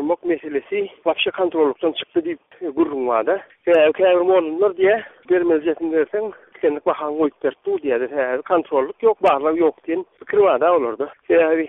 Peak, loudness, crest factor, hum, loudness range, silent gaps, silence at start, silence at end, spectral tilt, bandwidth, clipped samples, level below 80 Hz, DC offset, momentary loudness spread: -4 dBFS; -19 LUFS; 14 dB; none; 4 LU; none; 0 s; 0 s; -2.5 dB/octave; 3.9 kHz; under 0.1%; -62 dBFS; under 0.1%; 9 LU